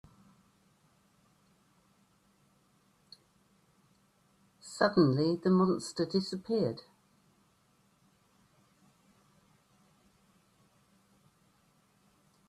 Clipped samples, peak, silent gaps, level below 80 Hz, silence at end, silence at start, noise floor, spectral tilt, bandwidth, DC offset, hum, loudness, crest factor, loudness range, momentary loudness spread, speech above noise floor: under 0.1%; -12 dBFS; none; -74 dBFS; 5.7 s; 4.65 s; -70 dBFS; -6.5 dB/octave; 11.5 kHz; under 0.1%; none; -30 LUFS; 24 dB; 10 LU; 16 LU; 41 dB